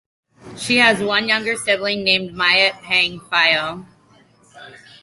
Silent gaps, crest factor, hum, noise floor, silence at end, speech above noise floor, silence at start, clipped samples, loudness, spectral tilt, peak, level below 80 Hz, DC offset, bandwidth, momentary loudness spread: none; 18 dB; none; -53 dBFS; 0.25 s; 35 dB; 0.45 s; under 0.1%; -16 LUFS; -2.5 dB/octave; -2 dBFS; -58 dBFS; under 0.1%; 11.5 kHz; 6 LU